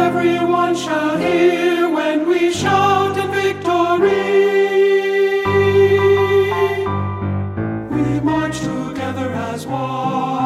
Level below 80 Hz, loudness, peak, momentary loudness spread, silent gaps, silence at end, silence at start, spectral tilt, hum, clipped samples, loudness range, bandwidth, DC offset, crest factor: -48 dBFS; -16 LUFS; -4 dBFS; 9 LU; none; 0 s; 0 s; -6 dB/octave; none; under 0.1%; 6 LU; 13.5 kHz; under 0.1%; 12 dB